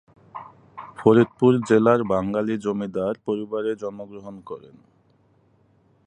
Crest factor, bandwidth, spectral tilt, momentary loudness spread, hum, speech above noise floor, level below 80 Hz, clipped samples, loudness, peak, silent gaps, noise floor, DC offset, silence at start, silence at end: 22 dB; 10 kHz; -8 dB/octave; 23 LU; none; 39 dB; -60 dBFS; under 0.1%; -21 LUFS; -2 dBFS; none; -61 dBFS; under 0.1%; 0.35 s; 1.45 s